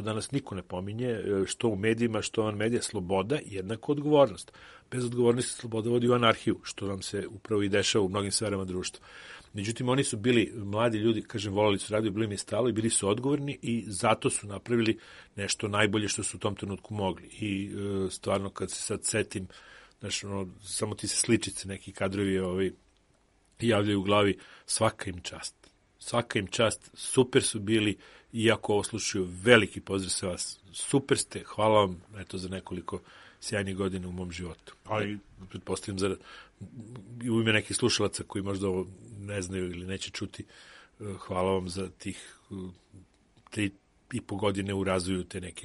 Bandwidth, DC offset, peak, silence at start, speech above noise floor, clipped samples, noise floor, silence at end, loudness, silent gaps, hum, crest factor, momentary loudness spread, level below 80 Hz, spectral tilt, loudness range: 11.5 kHz; under 0.1%; -2 dBFS; 0 s; 37 dB; under 0.1%; -66 dBFS; 0 s; -30 LUFS; none; none; 28 dB; 15 LU; -60 dBFS; -4.5 dB/octave; 8 LU